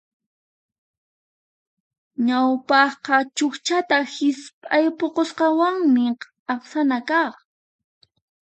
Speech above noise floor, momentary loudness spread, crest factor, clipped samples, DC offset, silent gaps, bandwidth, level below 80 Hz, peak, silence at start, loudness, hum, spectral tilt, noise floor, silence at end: over 70 dB; 9 LU; 20 dB; under 0.1%; under 0.1%; 4.53-4.62 s, 6.39-6.46 s; 9 kHz; -78 dBFS; -2 dBFS; 2.2 s; -21 LUFS; none; -3 dB/octave; under -90 dBFS; 1.15 s